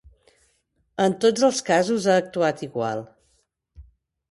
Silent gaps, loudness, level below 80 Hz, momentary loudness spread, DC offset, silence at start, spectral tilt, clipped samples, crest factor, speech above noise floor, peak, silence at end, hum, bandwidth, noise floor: none; -22 LUFS; -58 dBFS; 9 LU; under 0.1%; 1 s; -4.5 dB/octave; under 0.1%; 18 dB; 47 dB; -6 dBFS; 0.5 s; none; 11.5 kHz; -69 dBFS